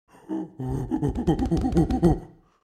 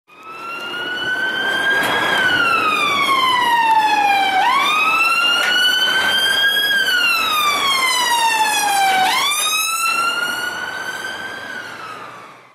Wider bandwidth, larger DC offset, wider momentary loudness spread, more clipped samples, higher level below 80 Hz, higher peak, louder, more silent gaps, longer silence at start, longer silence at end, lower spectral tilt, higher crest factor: second, 12.5 kHz vs 16 kHz; neither; about the same, 12 LU vs 14 LU; neither; first, -34 dBFS vs -60 dBFS; about the same, -6 dBFS vs -4 dBFS; second, -25 LUFS vs -15 LUFS; neither; first, 0.3 s vs 0.15 s; first, 0.35 s vs 0.15 s; first, -8.5 dB/octave vs 0 dB/octave; first, 20 dB vs 12 dB